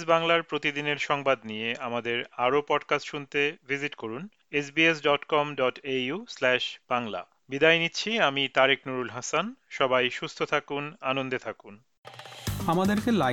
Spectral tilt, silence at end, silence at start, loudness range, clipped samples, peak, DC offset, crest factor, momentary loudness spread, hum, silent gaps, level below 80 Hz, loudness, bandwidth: -4 dB/octave; 0 s; 0 s; 4 LU; under 0.1%; -6 dBFS; under 0.1%; 22 dB; 12 LU; none; 11.98-12.03 s; -58 dBFS; -27 LUFS; 18 kHz